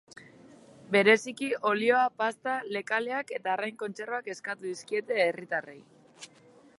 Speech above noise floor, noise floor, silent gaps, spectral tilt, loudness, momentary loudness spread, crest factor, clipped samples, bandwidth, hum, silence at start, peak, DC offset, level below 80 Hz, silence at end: 29 dB; -58 dBFS; none; -4 dB/octave; -29 LUFS; 14 LU; 22 dB; under 0.1%; 11.5 kHz; none; 0.15 s; -8 dBFS; under 0.1%; -82 dBFS; 0.55 s